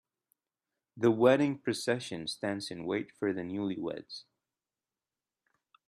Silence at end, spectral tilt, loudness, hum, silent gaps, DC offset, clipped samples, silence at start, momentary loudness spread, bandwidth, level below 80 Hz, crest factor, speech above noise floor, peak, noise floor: 1.65 s; -5.5 dB/octave; -32 LUFS; none; none; under 0.1%; under 0.1%; 0.95 s; 13 LU; 13.5 kHz; -74 dBFS; 22 dB; over 59 dB; -10 dBFS; under -90 dBFS